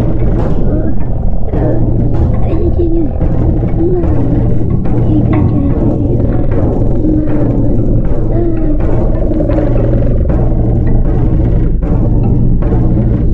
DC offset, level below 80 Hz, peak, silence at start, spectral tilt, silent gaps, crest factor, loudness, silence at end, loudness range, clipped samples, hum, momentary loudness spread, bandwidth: under 0.1%; -14 dBFS; 0 dBFS; 0 s; -12 dB/octave; none; 8 dB; -13 LUFS; 0 s; 1 LU; under 0.1%; none; 3 LU; 3.1 kHz